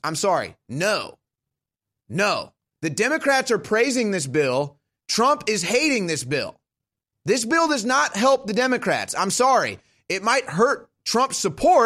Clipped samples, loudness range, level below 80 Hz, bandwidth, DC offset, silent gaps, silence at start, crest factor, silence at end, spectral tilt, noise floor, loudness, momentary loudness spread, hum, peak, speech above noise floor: under 0.1%; 3 LU; -58 dBFS; 16 kHz; under 0.1%; none; 0.05 s; 18 dB; 0 s; -3.5 dB/octave; -87 dBFS; -21 LUFS; 10 LU; none; -4 dBFS; 66 dB